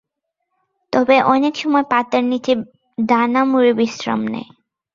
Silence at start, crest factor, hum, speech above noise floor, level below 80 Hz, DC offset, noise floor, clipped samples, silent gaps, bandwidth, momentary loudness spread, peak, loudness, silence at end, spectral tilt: 0.9 s; 16 dB; none; 61 dB; -62 dBFS; under 0.1%; -77 dBFS; under 0.1%; none; 7.4 kHz; 9 LU; -2 dBFS; -17 LUFS; 0.5 s; -5.5 dB/octave